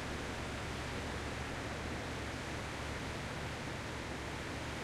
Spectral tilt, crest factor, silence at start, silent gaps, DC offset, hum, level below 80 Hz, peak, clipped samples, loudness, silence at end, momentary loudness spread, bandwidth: -4.5 dB/octave; 12 dB; 0 s; none; under 0.1%; none; -50 dBFS; -28 dBFS; under 0.1%; -41 LUFS; 0 s; 1 LU; 15.5 kHz